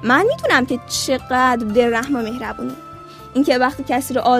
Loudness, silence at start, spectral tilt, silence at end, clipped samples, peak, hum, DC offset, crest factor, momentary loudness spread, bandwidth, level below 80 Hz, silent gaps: -18 LUFS; 0 s; -3.5 dB/octave; 0 s; under 0.1%; 0 dBFS; none; under 0.1%; 18 dB; 13 LU; 15.5 kHz; -46 dBFS; none